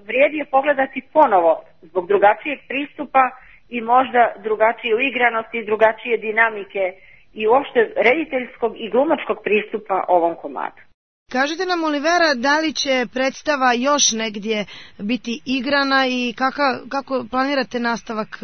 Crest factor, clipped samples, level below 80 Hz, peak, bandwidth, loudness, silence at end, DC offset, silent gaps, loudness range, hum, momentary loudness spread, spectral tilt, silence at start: 18 dB; under 0.1%; -60 dBFS; 0 dBFS; 6.6 kHz; -19 LUFS; 0.1 s; 0.3%; 10.94-11.26 s; 3 LU; none; 9 LU; -2.5 dB/octave; 0.1 s